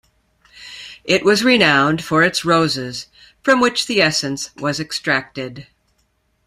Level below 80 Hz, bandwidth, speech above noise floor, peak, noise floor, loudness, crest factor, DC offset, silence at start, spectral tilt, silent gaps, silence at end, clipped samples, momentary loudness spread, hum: -56 dBFS; 15.5 kHz; 47 dB; 0 dBFS; -64 dBFS; -16 LUFS; 18 dB; under 0.1%; 0.55 s; -4 dB/octave; none; 0.85 s; under 0.1%; 18 LU; none